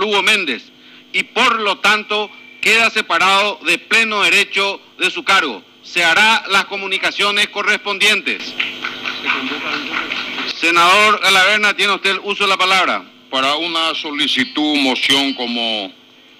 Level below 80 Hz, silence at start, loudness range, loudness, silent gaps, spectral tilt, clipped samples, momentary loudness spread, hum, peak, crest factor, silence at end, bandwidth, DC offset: -60 dBFS; 0 s; 4 LU; -14 LUFS; none; -1.5 dB/octave; under 0.1%; 10 LU; none; -2 dBFS; 14 dB; 0.5 s; 16 kHz; under 0.1%